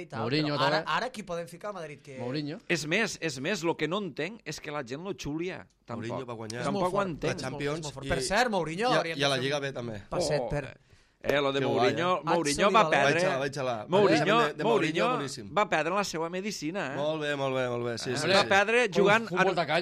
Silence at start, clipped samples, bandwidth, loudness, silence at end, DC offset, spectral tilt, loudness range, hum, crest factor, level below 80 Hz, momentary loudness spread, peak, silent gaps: 0 s; under 0.1%; 14.5 kHz; -28 LUFS; 0 s; under 0.1%; -4.5 dB/octave; 8 LU; none; 18 dB; -56 dBFS; 13 LU; -10 dBFS; none